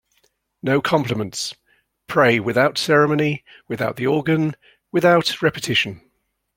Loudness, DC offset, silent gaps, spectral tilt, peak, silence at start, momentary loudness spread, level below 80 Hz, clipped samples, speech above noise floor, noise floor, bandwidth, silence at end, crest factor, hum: -19 LUFS; under 0.1%; none; -5 dB/octave; -2 dBFS; 0.65 s; 11 LU; -58 dBFS; under 0.1%; 50 dB; -69 dBFS; 16.5 kHz; 0.6 s; 20 dB; none